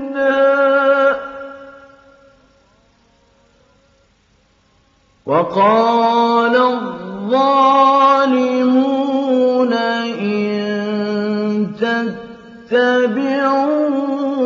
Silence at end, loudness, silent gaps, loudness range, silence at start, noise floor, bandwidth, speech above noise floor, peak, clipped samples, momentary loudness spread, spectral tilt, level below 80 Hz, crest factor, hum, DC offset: 0 s; -15 LUFS; none; 7 LU; 0 s; -56 dBFS; 7.4 kHz; 43 dB; -2 dBFS; under 0.1%; 10 LU; -6 dB/octave; -62 dBFS; 14 dB; none; under 0.1%